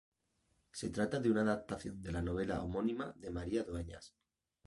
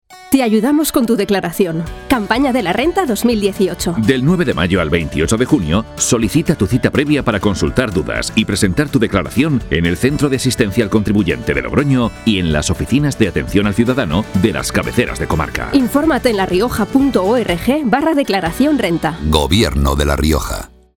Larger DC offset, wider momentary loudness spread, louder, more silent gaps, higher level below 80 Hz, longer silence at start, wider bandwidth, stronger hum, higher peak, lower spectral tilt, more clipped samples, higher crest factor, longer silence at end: neither; first, 11 LU vs 4 LU; second, -38 LUFS vs -15 LUFS; neither; second, -54 dBFS vs -30 dBFS; first, 0.75 s vs 0.1 s; second, 11.5 kHz vs 19 kHz; neither; second, -22 dBFS vs 0 dBFS; about the same, -6.5 dB/octave vs -5.5 dB/octave; neither; about the same, 18 dB vs 14 dB; first, 0.6 s vs 0.35 s